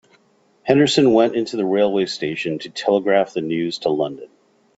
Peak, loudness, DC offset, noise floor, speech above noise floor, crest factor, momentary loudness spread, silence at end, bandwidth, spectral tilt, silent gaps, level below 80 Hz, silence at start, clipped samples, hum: -2 dBFS; -19 LUFS; under 0.1%; -58 dBFS; 40 dB; 18 dB; 11 LU; 0.5 s; 8 kHz; -5.5 dB/octave; none; -62 dBFS; 0.65 s; under 0.1%; none